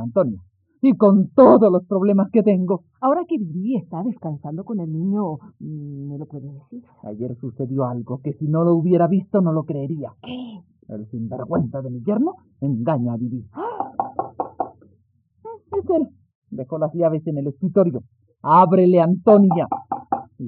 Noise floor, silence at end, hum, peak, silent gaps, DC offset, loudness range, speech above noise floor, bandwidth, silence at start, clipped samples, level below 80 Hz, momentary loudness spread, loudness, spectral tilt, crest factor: -61 dBFS; 0 s; none; -2 dBFS; 16.35-16.42 s; under 0.1%; 11 LU; 42 dB; 4.3 kHz; 0 s; under 0.1%; -66 dBFS; 19 LU; -20 LUFS; -9.5 dB/octave; 18 dB